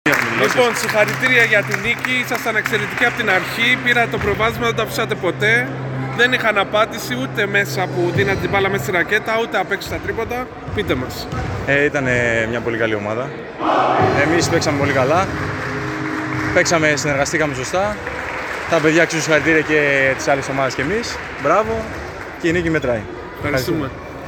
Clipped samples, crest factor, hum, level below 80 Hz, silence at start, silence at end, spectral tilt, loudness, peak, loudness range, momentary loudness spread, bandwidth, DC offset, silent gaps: under 0.1%; 16 dB; none; -42 dBFS; 0.05 s; 0 s; -4.5 dB/octave; -17 LUFS; 0 dBFS; 4 LU; 9 LU; 19.5 kHz; under 0.1%; none